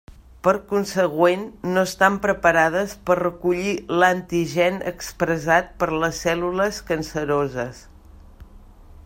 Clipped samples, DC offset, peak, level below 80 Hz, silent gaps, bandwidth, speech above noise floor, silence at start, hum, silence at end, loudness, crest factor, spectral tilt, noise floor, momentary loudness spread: under 0.1%; under 0.1%; -2 dBFS; -46 dBFS; none; 16.5 kHz; 24 dB; 0.45 s; none; 0.1 s; -21 LUFS; 20 dB; -5 dB/octave; -45 dBFS; 8 LU